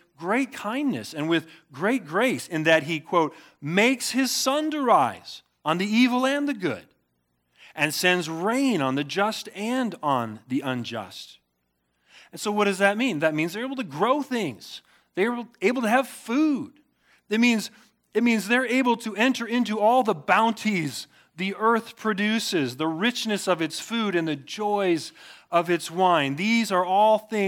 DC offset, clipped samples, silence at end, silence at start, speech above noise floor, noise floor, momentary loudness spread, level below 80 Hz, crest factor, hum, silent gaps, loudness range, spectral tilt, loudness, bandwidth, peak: under 0.1%; under 0.1%; 0 s; 0.2 s; 50 dB; -74 dBFS; 10 LU; -78 dBFS; 20 dB; none; none; 4 LU; -4 dB/octave; -24 LUFS; 18.5 kHz; -4 dBFS